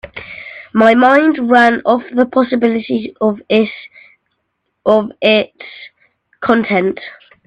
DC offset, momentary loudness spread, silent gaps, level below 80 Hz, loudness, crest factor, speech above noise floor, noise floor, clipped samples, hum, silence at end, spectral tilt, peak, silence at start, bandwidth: under 0.1%; 19 LU; none; -54 dBFS; -13 LUFS; 14 dB; 57 dB; -69 dBFS; under 0.1%; none; 0.35 s; -6.5 dB/octave; 0 dBFS; 0.05 s; 8.4 kHz